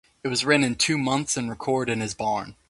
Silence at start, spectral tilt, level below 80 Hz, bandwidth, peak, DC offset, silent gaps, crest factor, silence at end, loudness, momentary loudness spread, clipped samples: 0.25 s; -3.5 dB/octave; -56 dBFS; 11.5 kHz; -4 dBFS; under 0.1%; none; 20 dB; 0.15 s; -24 LUFS; 7 LU; under 0.1%